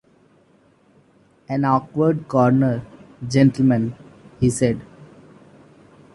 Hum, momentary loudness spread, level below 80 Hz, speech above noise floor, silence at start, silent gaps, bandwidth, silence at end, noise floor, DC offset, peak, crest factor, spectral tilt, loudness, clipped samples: none; 12 LU; -50 dBFS; 38 dB; 1.5 s; none; 11.5 kHz; 1.1 s; -56 dBFS; under 0.1%; -4 dBFS; 18 dB; -7.5 dB/octave; -20 LUFS; under 0.1%